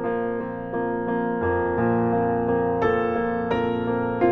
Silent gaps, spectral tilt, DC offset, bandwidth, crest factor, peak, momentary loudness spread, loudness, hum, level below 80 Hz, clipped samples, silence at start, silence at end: none; -9.5 dB/octave; under 0.1%; 5.8 kHz; 16 dB; -8 dBFS; 5 LU; -24 LUFS; none; -48 dBFS; under 0.1%; 0 s; 0 s